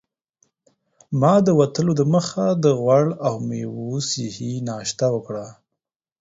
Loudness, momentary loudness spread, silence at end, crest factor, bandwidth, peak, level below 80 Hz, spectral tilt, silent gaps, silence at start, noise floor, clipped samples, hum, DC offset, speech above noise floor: -20 LUFS; 11 LU; 0.7 s; 18 dB; 8 kHz; -4 dBFS; -60 dBFS; -6.5 dB/octave; none; 1.1 s; -83 dBFS; under 0.1%; none; under 0.1%; 63 dB